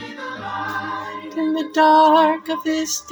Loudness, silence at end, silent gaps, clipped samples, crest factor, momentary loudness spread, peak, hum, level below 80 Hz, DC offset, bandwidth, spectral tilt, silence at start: -18 LUFS; 0 s; none; under 0.1%; 16 dB; 16 LU; -2 dBFS; none; -64 dBFS; under 0.1%; over 20 kHz; -3 dB/octave; 0 s